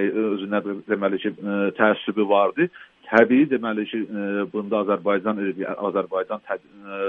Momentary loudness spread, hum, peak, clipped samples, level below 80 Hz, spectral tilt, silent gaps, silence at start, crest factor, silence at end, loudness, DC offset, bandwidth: 9 LU; none; 0 dBFS; under 0.1%; -70 dBFS; -8 dB/octave; none; 0 s; 22 dB; 0 s; -23 LUFS; under 0.1%; 6.4 kHz